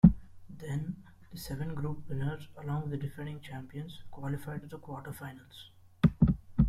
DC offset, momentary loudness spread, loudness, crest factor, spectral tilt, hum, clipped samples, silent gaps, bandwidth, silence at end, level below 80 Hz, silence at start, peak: under 0.1%; 19 LU; -35 LUFS; 26 dB; -8.5 dB/octave; none; under 0.1%; none; 14.5 kHz; 0 s; -44 dBFS; 0.05 s; -6 dBFS